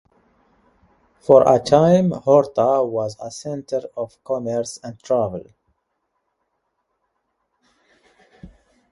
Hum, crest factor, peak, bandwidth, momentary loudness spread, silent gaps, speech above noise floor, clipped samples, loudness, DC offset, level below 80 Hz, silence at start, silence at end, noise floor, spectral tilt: none; 22 dB; 0 dBFS; 11.5 kHz; 17 LU; none; 55 dB; under 0.1%; -18 LUFS; under 0.1%; -56 dBFS; 1.3 s; 0.45 s; -73 dBFS; -7 dB/octave